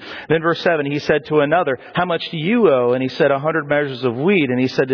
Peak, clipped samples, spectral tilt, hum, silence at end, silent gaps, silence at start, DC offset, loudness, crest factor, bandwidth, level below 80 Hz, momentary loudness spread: -4 dBFS; under 0.1%; -7 dB/octave; none; 0 s; none; 0 s; under 0.1%; -18 LUFS; 14 dB; 5.4 kHz; -56 dBFS; 6 LU